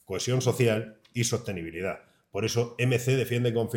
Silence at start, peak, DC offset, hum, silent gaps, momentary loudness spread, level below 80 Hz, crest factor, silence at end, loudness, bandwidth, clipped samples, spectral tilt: 0.1 s; -10 dBFS; under 0.1%; none; none; 10 LU; -62 dBFS; 18 dB; 0 s; -28 LUFS; 17 kHz; under 0.1%; -5 dB/octave